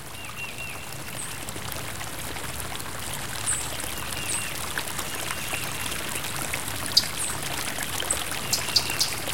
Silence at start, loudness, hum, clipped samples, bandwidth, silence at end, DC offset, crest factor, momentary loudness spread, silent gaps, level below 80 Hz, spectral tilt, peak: 0 s; -28 LUFS; none; under 0.1%; 17 kHz; 0 s; 1%; 28 dB; 11 LU; none; -48 dBFS; -1.5 dB/octave; -2 dBFS